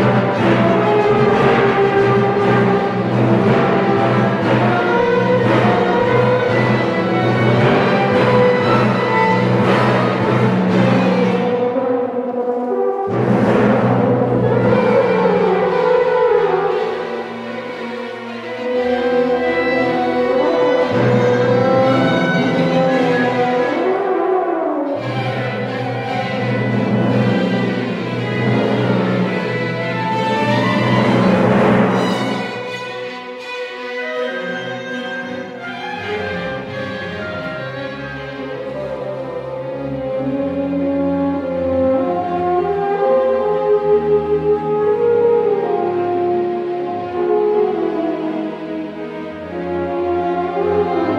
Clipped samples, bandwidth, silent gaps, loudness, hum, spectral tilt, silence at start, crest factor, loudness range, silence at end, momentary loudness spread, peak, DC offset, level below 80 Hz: under 0.1%; 11 kHz; none; -16 LUFS; none; -7.5 dB/octave; 0 s; 14 dB; 10 LU; 0 s; 11 LU; -2 dBFS; under 0.1%; -48 dBFS